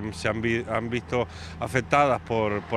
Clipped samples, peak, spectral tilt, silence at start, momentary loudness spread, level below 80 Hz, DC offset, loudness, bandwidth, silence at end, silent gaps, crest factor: under 0.1%; -6 dBFS; -6 dB/octave; 0 s; 7 LU; -48 dBFS; under 0.1%; -26 LUFS; 13.5 kHz; 0 s; none; 20 dB